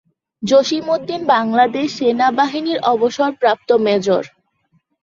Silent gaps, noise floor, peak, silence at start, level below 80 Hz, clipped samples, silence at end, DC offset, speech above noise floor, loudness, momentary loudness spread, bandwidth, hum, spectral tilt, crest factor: none; -62 dBFS; -2 dBFS; 0.4 s; -62 dBFS; under 0.1%; 0.75 s; under 0.1%; 47 dB; -16 LUFS; 5 LU; 7.6 kHz; none; -4.5 dB/octave; 14 dB